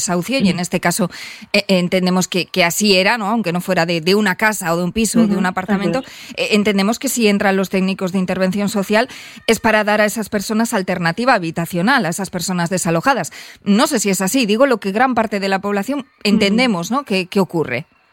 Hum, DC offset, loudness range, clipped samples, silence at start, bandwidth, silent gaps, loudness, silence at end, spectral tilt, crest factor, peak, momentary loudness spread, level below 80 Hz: none; under 0.1%; 2 LU; under 0.1%; 0 s; 17 kHz; none; -16 LUFS; 0.3 s; -4.5 dB/octave; 16 dB; 0 dBFS; 7 LU; -50 dBFS